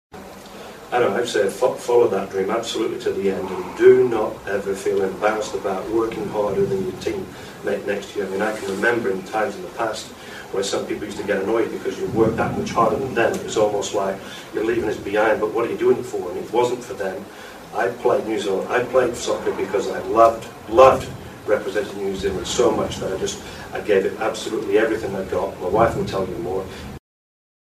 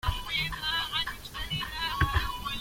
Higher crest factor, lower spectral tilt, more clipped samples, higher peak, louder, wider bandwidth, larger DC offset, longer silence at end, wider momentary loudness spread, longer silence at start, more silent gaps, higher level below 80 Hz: about the same, 22 dB vs 18 dB; first, -5 dB/octave vs -3.5 dB/octave; neither; first, 0 dBFS vs -14 dBFS; first, -21 LUFS vs -30 LUFS; about the same, 15 kHz vs 16.5 kHz; neither; first, 0.75 s vs 0 s; first, 11 LU vs 6 LU; about the same, 0.15 s vs 0.05 s; neither; second, -48 dBFS vs -38 dBFS